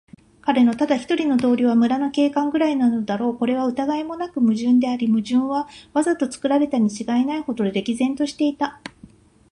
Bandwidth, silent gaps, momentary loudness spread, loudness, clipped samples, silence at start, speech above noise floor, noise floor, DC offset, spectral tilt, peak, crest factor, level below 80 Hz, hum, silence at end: 10.5 kHz; none; 7 LU; -21 LUFS; under 0.1%; 0.45 s; 29 dB; -48 dBFS; under 0.1%; -5.5 dB/octave; -4 dBFS; 16 dB; -60 dBFS; none; 0.45 s